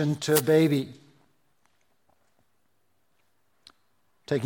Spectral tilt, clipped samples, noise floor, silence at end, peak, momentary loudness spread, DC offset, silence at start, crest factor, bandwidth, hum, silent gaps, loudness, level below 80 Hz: -5.5 dB/octave; under 0.1%; -74 dBFS; 0 s; -6 dBFS; 11 LU; under 0.1%; 0 s; 24 dB; 17 kHz; none; none; -24 LUFS; -72 dBFS